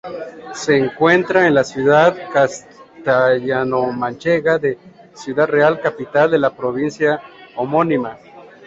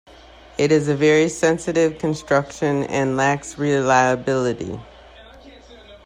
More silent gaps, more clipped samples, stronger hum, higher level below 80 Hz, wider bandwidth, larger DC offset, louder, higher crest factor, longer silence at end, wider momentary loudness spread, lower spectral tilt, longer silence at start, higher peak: neither; neither; neither; second, -56 dBFS vs -50 dBFS; second, 8 kHz vs 11.5 kHz; neither; first, -16 LUFS vs -19 LUFS; about the same, 16 dB vs 16 dB; about the same, 0.2 s vs 0.1 s; first, 13 LU vs 9 LU; about the same, -5.5 dB/octave vs -5.5 dB/octave; second, 0.05 s vs 0.6 s; about the same, -2 dBFS vs -4 dBFS